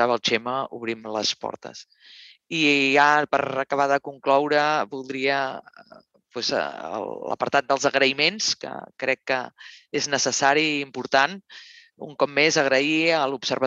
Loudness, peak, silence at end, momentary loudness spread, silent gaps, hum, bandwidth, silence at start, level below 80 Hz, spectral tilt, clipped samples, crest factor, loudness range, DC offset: -22 LUFS; -4 dBFS; 0 s; 13 LU; none; none; 8.4 kHz; 0 s; -74 dBFS; -2.5 dB/octave; under 0.1%; 20 dB; 4 LU; under 0.1%